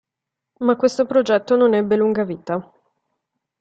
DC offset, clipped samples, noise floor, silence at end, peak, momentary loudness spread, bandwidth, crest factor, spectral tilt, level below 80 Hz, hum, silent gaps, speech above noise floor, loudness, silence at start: under 0.1%; under 0.1%; -84 dBFS; 1 s; -4 dBFS; 10 LU; 8.2 kHz; 16 dB; -6 dB/octave; -64 dBFS; none; none; 66 dB; -19 LUFS; 0.6 s